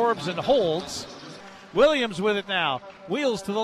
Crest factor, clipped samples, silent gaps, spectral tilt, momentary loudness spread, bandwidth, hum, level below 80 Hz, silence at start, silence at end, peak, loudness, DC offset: 18 dB; under 0.1%; none; -4.5 dB/octave; 18 LU; 14 kHz; none; -56 dBFS; 0 s; 0 s; -8 dBFS; -24 LUFS; under 0.1%